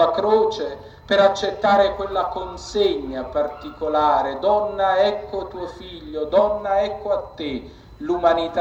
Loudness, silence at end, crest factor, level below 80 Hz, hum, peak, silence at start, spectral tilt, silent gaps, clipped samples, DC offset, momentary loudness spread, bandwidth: -21 LUFS; 0 s; 16 dB; -46 dBFS; none; -4 dBFS; 0 s; -5 dB/octave; none; under 0.1%; under 0.1%; 13 LU; 8 kHz